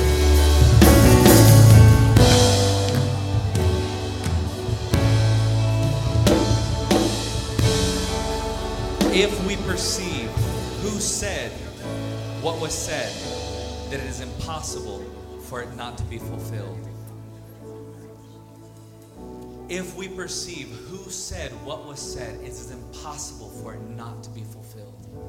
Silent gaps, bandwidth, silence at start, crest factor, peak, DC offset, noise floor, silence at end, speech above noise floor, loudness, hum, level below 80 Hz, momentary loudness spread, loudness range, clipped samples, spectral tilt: none; 17 kHz; 0 s; 20 dB; 0 dBFS; under 0.1%; -44 dBFS; 0 s; 15 dB; -19 LUFS; none; -30 dBFS; 24 LU; 20 LU; under 0.1%; -5 dB/octave